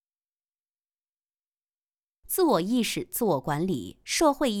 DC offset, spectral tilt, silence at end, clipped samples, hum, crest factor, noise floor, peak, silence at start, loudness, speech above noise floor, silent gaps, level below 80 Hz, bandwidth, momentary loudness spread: under 0.1%; -4.5 dB/octave; 0 s; under 0.1%; none; 20 dB; under -90 dBFS; -10 dBFS; 2.3 s; -26 LUFS; over 64 dB; none; -58 dBFS; 19.5 kHz; 7 LU